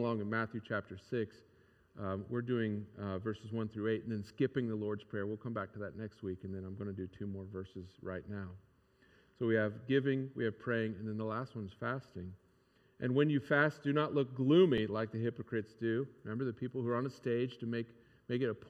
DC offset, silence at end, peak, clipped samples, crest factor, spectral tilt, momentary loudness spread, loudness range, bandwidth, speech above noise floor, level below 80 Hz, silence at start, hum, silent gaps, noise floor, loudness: under 0.1%; 0 s; -16 dBFS; under 0.1%; 20 dB; -8.5 dB/octave; 13 LU; 10 LU; 8.8 kHz; 34 dB; -74 dBFS; 0 s; none; none; -70 dBFS; -37 LUFS